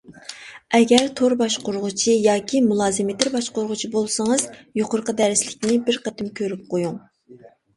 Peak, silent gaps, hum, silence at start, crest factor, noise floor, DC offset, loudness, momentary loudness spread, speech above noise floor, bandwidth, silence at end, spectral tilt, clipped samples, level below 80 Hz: 0 dBFS; none; none; 0.1 s; 20 dB; -48 dBFS; under 0.1%; -21 LUFS; 11 LU; 27 dB; 11.5 kHz; 0.3 s; -3.5 dB/octave; under 0.1%; -60 dBFS